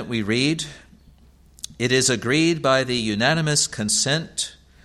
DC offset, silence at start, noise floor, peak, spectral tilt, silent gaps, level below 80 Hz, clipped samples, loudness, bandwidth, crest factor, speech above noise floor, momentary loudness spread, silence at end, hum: under 0.1%; 0 s; -52 dBFS; -4 dBFS; -3.5 dB/octave; none; -52 dBFS; under 0.1%; -20 LUFS; 15 kHz; 20 dB; 30 dB; 10 LU; 0.3 s; none